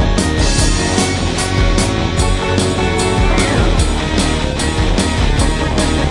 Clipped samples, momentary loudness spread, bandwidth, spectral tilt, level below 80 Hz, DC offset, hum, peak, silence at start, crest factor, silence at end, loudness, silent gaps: under 0.1%; 2 LU; 11.5 kHz; -4.5 dB/octave; -18 dBFS; under 0.1%; none; 0 dBFS; 0 s; 12 dB; 0 s; -15 LUFS; none